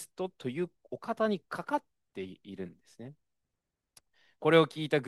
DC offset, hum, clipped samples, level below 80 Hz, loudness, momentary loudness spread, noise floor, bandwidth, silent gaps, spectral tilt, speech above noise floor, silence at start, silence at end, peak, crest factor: under 0.1%; none; under 0.1%; -80 dBFS; -31 LUFS; 24 LU; -86 dBFS; 12.5 kHz; none; -6 dB/octave; 54 dB; 0 s; 0 s; -10 dBFS; 24 dB